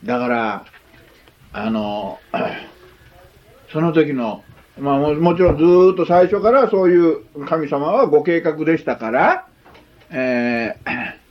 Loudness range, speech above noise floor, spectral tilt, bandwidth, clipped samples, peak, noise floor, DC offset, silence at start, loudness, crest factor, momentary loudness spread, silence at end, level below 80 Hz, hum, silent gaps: 10 LU; 32 dB; -8.5 dB/octave; 6.2 kHz; under 0.1%; 0 dBFS; -48 dBFS; under 0.1%; 0 s; -17 LUFS; 16 dB; 13 LU; 0.15 s; -44 dBFS; none; none